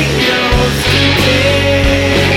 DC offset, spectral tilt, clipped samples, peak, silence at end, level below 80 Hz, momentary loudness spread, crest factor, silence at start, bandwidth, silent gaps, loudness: under 0.1%; -4.5 dB/octave; under 0.1%; 0 dBFS; 0 s; -22 dBFS; 2 LU; 10 dB; 0 s; 17 kHz; none; -10 LUFS